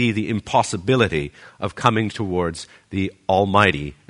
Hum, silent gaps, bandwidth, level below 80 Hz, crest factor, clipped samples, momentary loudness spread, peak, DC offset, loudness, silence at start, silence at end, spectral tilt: none; none; 11 kHz; -46 dBFS; 20 dB; under 0.1%; 13 LU; 0 dBFS; under 0.1%; -20 LUFS; 0 s; 0.15 s; -5.5 dB/octave